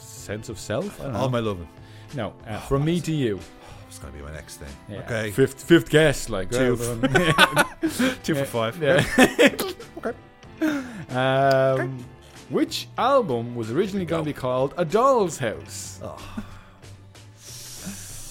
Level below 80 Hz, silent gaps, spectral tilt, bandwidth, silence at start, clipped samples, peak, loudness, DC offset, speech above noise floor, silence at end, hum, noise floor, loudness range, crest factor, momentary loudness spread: -46 dBFS; none; -5 dB/octave; 17 kHz; 0 s; under 0.1%; 0 dBFS; -23 LUFS; under 0.1%; 24 dB; 0 s; none; -46 dBFS; 8 LU; 24 dB; 20 LU